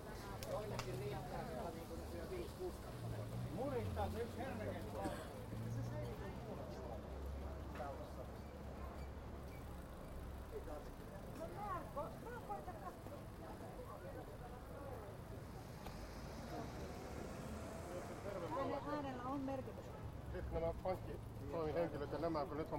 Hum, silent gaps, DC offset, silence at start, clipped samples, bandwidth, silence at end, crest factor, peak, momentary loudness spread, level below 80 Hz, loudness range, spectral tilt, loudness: none; none; under 0.1%; 0 s; under 0.1%; 16.5 kHz; 0 s; 20 dB; -28 dBFS; 9 LU; -56 dBFS; 6 LU; -6.5 dB/octave; -48 LUFS